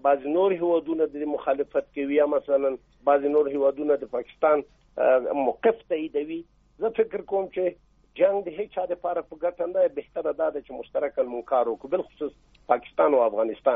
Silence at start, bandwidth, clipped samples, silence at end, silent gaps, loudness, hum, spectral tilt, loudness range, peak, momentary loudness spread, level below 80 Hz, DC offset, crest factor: 0.05 s; 3.8 kHz; under 0.1%; 0 s; none; -25 LUFS; none; -4 dB/octave; 4 LU; -6 dBFS; 9 LU; -62 dBFS; under 0.1%; 18 dB